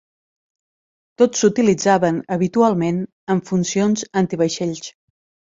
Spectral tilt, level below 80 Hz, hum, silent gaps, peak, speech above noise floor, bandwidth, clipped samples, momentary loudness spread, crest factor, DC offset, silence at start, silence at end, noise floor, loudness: -5.5 dB/octave; -60 dBFS; none; 3.12-3.27 s; -2 dBFS; over 72 dB; 7.8 kHz; under 0.1%; 9 LU; 18 dB; under 0.1%; 1.2 s; 0.65 s; under -90 dBFS; -18 LUFS